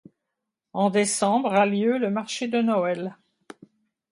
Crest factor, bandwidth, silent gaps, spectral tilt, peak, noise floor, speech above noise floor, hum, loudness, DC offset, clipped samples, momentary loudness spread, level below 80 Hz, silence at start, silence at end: 18 dB; 11.5 kHz; none; -4.5 dB/octave; -8 dBFS; -83 dBFS; 61 dB; none; -23 LUFS; under 0.1%; under 0.1%; 8 LU; -74 dBFS; 0.75 s; 1 s